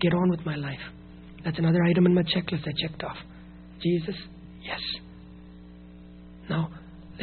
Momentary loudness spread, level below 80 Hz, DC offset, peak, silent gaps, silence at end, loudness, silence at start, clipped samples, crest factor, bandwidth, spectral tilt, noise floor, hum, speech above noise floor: 26 LU; -52 dBFS; under 0.1%; -10 dBFS; none; 0 s; -27 LUFS; 0 s; under 0.1%; 18 dB; 4.5 kHz; -5.5 dB/octave; -46 dBFS; none; 21 dB